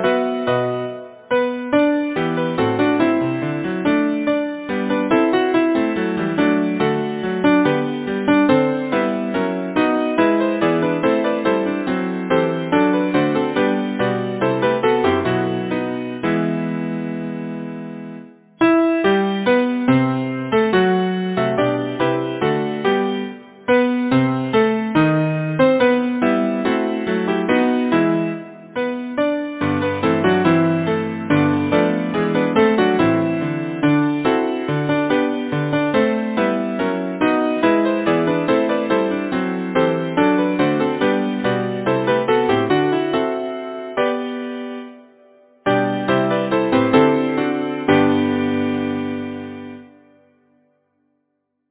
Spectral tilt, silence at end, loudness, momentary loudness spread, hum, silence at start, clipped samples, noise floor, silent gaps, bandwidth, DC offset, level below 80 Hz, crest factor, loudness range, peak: -10.5 dB/octave; 1.85 s; -18 LUFS; 8 LU; none; 0 s; under 0.1%; -72 dBFS; none; 4 kHz; under 0.1%; -52 dBFS; 18 dB; 3 LU; 0 dBFS